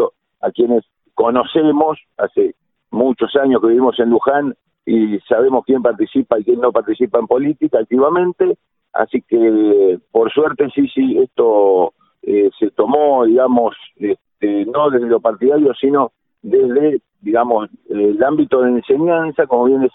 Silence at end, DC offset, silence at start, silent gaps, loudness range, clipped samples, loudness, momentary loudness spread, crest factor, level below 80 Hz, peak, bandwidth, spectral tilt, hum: 0.05 s; under 0.1%; 0 s; none; 2 LU; under 0.1%; -15 LUFS; 8 LU; 14 dB; -58 dBFS; 0 dBFS; 4 kHz; -11 dB/octave; none